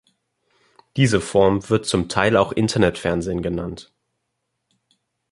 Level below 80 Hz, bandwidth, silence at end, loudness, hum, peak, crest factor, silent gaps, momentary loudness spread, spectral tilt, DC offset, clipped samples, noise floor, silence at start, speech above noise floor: -44 dBFS; 11.5 kHz; 1.5 s; -20 LUFS; none; -2 dBFS; 20 dB; none; 11 LU; -5.5 dB/octave; under 0.1%; under 0.1%; -76 dBFS; 0.95 s; 57 dB